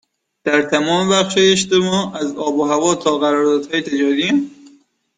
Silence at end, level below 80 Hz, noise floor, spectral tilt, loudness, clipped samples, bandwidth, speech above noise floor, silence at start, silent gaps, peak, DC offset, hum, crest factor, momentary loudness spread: 0.5 s; -58 dBFS; -51 dBFS; -4 dB/octave; -16 LUFS; under 0.1%; 9.6 kHz; 35 dB; 0.45 s; none; -2 dBFS; under 0.1%; none; 14 dB; 7 LU